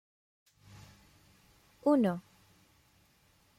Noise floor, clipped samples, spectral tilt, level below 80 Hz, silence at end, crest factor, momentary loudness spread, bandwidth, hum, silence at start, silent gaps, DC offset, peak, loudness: -68 dBFS; under 0.1%; -8 dB/octave; -72 dBFS; 1.4 s; 22 dB; 28 LU; 15.5 kHz; none; 1.85 s; none; under 0.1%; -16 dBFS; -31 LUFS